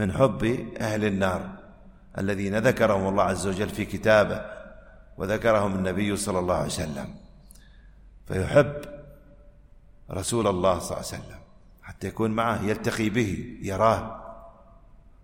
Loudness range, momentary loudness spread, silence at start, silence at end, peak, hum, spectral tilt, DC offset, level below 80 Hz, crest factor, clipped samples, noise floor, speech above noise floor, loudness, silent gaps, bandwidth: 5 LU; 18 LU; 0 s; 0.75 s; -6 dBFS; none; -5.5 dB/octave; under 0.1%; -48 dBFS; 20 dB; under 0.1%; -51 dBFS; 26 dB; -25 LUFS; none; 16.5 kHz